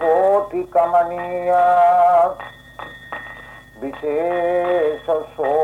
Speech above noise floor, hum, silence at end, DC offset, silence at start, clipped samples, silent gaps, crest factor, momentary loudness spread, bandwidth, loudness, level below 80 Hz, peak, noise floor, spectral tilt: 22 dB; none; 0 s; under 0.1%; 0 s; under 0.1%; none; 12 dB; 21 LU; 9.6 kHz; -17 LUFS; -52 dBFS; -6 dBFS; -39 dBFS; -6 dB/octave